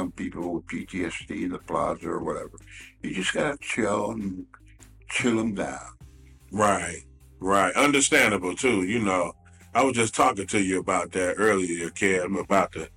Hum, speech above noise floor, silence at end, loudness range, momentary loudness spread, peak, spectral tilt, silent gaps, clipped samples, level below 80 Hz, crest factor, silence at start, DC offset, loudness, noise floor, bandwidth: none; 24 dB; 0.1 s; 7 LU; 14 LU; -8 dBFS; -3.5 dB/octave; none; under 0.1%; -52 dBFS; 18 dB; 0 s; under 0.1%; -25 LUFS; -49 dBFS; 16.5 kHz